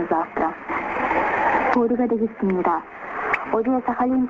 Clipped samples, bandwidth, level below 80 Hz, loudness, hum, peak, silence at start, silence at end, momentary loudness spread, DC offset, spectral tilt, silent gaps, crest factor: under 0.1%; 7.4 kHz; -52 dBFS; -22 LUFS; none; -4 dBFS; 0 s; 0 s; 6 LU; under 0.1%; -8 dB/octave; none; 18 dB